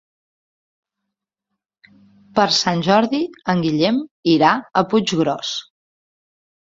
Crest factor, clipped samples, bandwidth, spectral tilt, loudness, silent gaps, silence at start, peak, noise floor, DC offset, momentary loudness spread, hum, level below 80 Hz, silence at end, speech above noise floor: 20 dB; under 0.1%; 7.8 kHz; -5 dB/octave; -18 LUFS; 4.11-4.23 s; 2.35 s; -2 dBFS; -81 dBFS; under 0.1%; 8 LU; none; -60 dBFS; 1 s; 64 dB